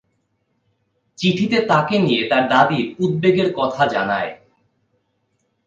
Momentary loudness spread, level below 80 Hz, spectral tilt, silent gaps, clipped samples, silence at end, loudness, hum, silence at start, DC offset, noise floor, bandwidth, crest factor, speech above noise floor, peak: 6 LU; -60 dBFS; -6.5 dB/octave; none; under 0.1%; 1.3 s; -18 LUFS; none; 1.2 s; under 0.1%; -68 dBFS; 7.8 kHz; 20 dB; 51 dB; 0 dBFS